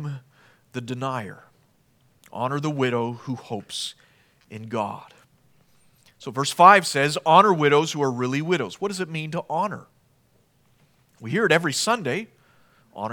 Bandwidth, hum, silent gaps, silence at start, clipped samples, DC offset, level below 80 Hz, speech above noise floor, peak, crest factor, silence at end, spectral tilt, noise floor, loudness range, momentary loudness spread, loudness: 19 kHz; none; none; 0 s; under 0.1%; under 0.1%; -74 dBFS; 40 dB; 0 dBFS; 24 dB; 0 s; -4.5 dB/octave; -62 dBFS; 11 LU; 23 LU; -22 LUFS